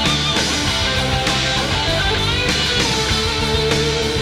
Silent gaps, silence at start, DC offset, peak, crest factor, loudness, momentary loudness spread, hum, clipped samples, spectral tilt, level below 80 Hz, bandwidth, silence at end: none; 0 s; under 0.1%; -2 dBFS; 16 dB; -16 LUFS; 2 LU; none; under 0.1%; -3 dB/octave; -28 dBFS; 16 kHz; 0 s